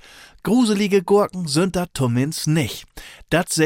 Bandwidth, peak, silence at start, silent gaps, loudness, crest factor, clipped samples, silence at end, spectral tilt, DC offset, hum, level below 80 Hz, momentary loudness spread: 17 kHz; -4 dBFS; 0.45 s; none; -20 LUFS; 14 dB; under 0.1%; 0 s; -5 dB/octave; under 0.1%; none; -46 dBFS; 13 LU